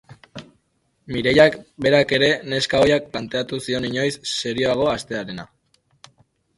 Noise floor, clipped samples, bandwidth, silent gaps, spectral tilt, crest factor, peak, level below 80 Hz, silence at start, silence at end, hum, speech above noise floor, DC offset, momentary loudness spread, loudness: -67 dBFS; under 0.1%; 11.5 kHz; none; -4.5 dB/octave; 20 dB; 0 dBFS; -50 dBFS; 0.1 s; 1.1 s; none; 47 dB; under 0.1%; 18 LU; -20 LUFS